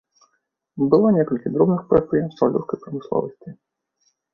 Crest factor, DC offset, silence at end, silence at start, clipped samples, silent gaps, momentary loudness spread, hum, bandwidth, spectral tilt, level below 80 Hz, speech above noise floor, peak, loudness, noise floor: 18 dB; under 0.1%; 0.8 s; 0.75 s; under 0.1%; none; 13 LU; none; 6 kHz; -10.5 dB/octave; -54 dBFS; 52 dB; -2 dBFS; -20 LUFS; -72 dBFS